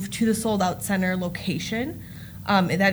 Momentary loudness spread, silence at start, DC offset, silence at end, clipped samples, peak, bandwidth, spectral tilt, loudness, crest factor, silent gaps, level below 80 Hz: 12 LU; 0 s; under 0.1%; 0 s; under 0.1%; -6 dBFS; over 20 kHz; -5 dB/octave; -24 LUFS; 18 dB; none; -50 dBFS